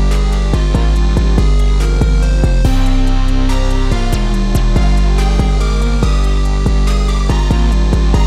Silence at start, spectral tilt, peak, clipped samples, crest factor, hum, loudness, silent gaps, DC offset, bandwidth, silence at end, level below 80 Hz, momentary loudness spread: 0 s; -6 dB/octave; 0 dBFS; under 0.1%; 10 dB; none; -14 LUFS; none; under 0.1%; 11.5 kHz; 0 s; -12 dBFS; 3 LU